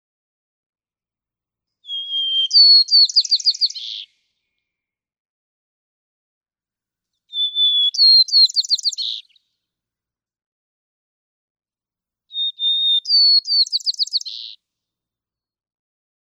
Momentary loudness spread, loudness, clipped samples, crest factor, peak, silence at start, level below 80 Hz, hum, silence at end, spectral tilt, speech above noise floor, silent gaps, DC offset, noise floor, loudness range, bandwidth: 19 LU; -13 LUFS; under 0.1%; 16 dB; -4 dBFS; 1.9 s; under -90 dBFS; none; 1.85 s; 9 dB/octave; over 74 dB; 5.19-6.41 s, 10.46-11.55 s; under 0.1%; under -90 dBFS; 12 LU; 18 kHz